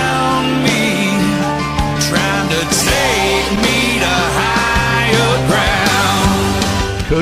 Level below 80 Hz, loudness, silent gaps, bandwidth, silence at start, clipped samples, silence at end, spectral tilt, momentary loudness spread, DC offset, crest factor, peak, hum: -28 dBFS; -13 LUFS; none; 16 kHz; 0 s; under 0.1%; 0 s; -4 dB/octave; 4 LU; under 0.1%; 14 dB; 0 dBFS; none